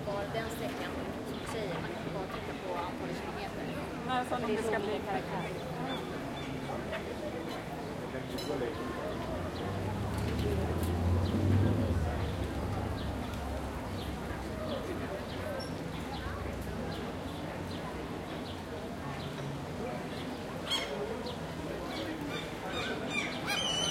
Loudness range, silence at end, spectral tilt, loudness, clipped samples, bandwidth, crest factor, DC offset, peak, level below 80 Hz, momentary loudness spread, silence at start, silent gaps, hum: 6 LU; 0 s; -5.5 dB/octave; -36 LUFS; under 0.1%; 16.5 kHz; 20 dB; under 0.1%; -16 dBFS; -48 dBFS; 7 LU; 0 s; none; none